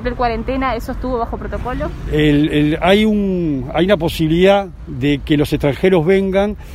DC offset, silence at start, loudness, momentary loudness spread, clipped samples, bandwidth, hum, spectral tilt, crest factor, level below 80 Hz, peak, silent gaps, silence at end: under 0.1%; 0 s; -16 LUFS; 10 LU; under 0.1%; 16 kHz; none; -7 dB/octave; 16 dB; -30 dBFS; 0 dBFS; none; 0 s